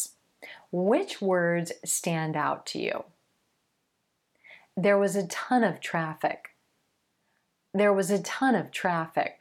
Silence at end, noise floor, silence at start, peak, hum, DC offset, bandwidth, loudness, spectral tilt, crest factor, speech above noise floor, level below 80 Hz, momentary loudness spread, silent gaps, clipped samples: 0.05 s; -77 dBFS; 0 s; -10 dBFS; none; under 0.1%; 17.5 kHz; -27 LUFS; -4.5 dB/octave; 18 dB; 50 dB; -78 dBFS; 11 LU; none; under 0.1%